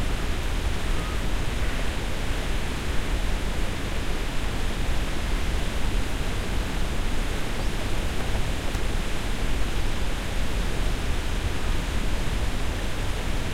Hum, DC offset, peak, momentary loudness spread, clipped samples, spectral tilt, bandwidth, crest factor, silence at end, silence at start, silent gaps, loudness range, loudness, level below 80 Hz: none; under 0.1%; -12 dBFS; 1 LU; under 0.1%; -4.5 dB/octave; 15.5 kHz; 12 dB; 0 s; 0 s; none; 0 LU; -30 LUFS; -26 dBFS